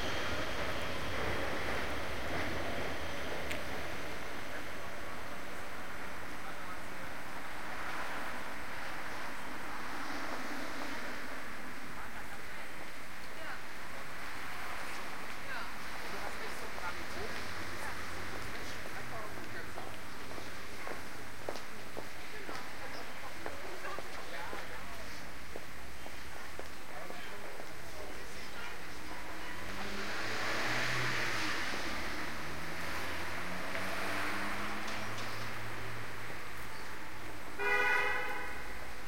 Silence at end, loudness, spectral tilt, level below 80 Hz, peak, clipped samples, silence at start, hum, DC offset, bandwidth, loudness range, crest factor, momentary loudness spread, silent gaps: 0 s; -40 LUFS; -3.5 dB/octave; -56 dBFS; -18 dBFS; under 0.1%; 0 s; none; 2%; 16 kHz; 8 LU; 22 dB; 10 LU; none